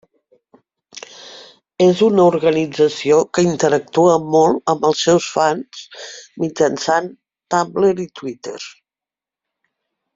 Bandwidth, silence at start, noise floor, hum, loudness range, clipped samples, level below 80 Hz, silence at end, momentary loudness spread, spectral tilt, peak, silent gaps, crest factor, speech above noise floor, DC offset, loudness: 7.8 kHz; 0.95 s; -89 dBFS; none; 6 LU; under 0.1%; -60 dBFS; 1.45 s; 20 LU; -5 dB/octave; -2 dBFS; none; 16 dB; 73 dB; under 0.1%; -16 LUFS